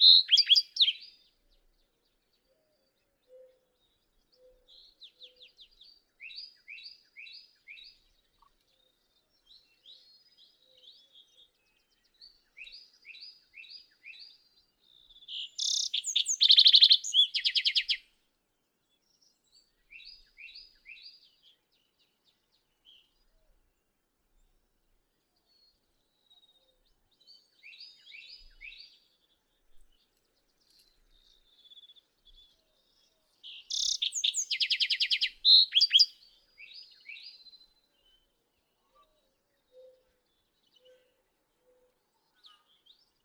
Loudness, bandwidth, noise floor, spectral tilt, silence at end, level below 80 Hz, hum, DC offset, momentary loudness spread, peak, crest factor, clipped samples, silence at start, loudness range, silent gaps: -23 LUFS; over 20 kHz; -78 dBFS; 5.5 dB/octave; 5.95 s; -74 dBFS; none; under 0.1%; 30 LU; -8 dBFS; 26 dB; under 0.1%; 0 s; 28 LU; none